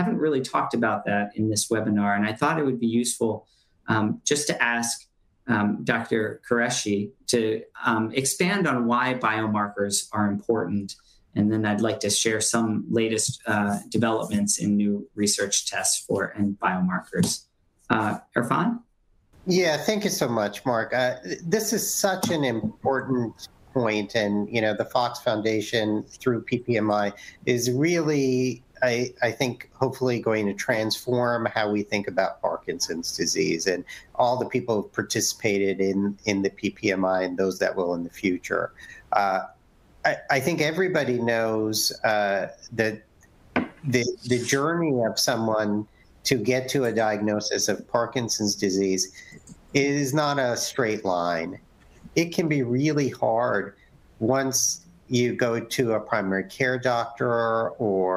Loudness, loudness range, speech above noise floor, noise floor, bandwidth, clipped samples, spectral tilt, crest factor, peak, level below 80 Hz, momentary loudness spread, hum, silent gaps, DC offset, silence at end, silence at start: -25 LUFS; 2 LU; 38 dB; -62 dBFS; 16 kHz; under 0.1%; -4 dB/octave; 22 dB; -4 dBFS; -60 dBFS; 5 LU; none; none; under 0.1%; 0 s; 0 s